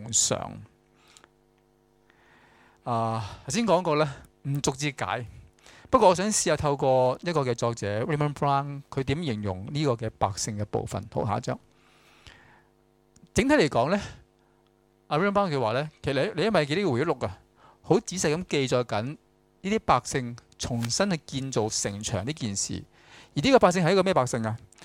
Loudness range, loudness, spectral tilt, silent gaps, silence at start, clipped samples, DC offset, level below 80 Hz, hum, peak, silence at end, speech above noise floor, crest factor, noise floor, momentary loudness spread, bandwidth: 6 LU; -26 LUFS; -4.5 dB/octave; none; 0 s; under 0.1%; under 0.1%; -54 dBFS; none; -6 dBFS; 0 s; 38 dB; 22 dB; -64 dBFS; 11 LU; 16.5 kHz